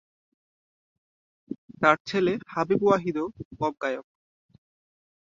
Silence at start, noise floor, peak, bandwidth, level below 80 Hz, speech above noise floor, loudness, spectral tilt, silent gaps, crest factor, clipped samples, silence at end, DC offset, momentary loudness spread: 1.5 s; under -90 dBFS; -4 dBFS; 7.6 kHz; -64 dBFS; over 65 dB; -26 LUFS; -6.5 dB/octave; 1.58-1.69 s, 2.00-2.05 s, 3.45-3.51 s; 26 dB; under 0.1%; 1.2 s; under 0.1%; 16 LU